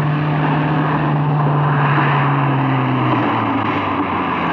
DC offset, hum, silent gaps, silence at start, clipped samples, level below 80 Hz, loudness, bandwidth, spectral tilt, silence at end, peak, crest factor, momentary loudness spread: under 0.1%; none; none; 0 s; under 0.1%; -50 dBFS; -16 LUFS; 5 kHz; -9.5 dB/octave; 0 s; -4 dBFS; 12 dB; 4 LU